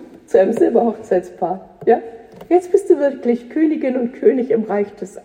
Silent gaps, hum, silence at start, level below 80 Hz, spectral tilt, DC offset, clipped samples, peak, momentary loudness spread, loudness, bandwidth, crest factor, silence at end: none; none; 0 s; -60 dBFS; -7.5 dB/octave; under 0.1%; under 0.1%; -2 dBFS; 8 LU; -17 LUFS; 10.5 kHz; 16 dB; 0.05 s